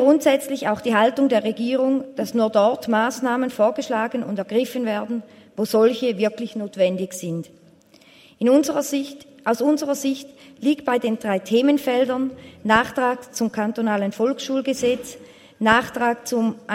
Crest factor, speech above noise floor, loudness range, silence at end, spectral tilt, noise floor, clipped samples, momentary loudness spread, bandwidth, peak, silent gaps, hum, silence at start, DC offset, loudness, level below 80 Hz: 20 dB; 31 dB; 3 LU; 0 s; -4.5 dB/octave; -52 dBFS; under 0.1%; 10 LU; 16 kHz; -2 dBFS; none; none; 0 s; under 0.1%; -21 LUFS; -62 dBFS